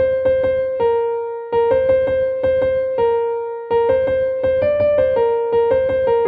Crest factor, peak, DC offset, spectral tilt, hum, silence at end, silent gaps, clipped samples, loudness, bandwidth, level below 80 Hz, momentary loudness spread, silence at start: 10 dB; -6 dBFS; under 0.1%; -8.5 dB/octave; none; 0 s; none; under 0.1%; -17 LUFS; 4.6 kHz; -46 dBFS; 4 LU; 0 s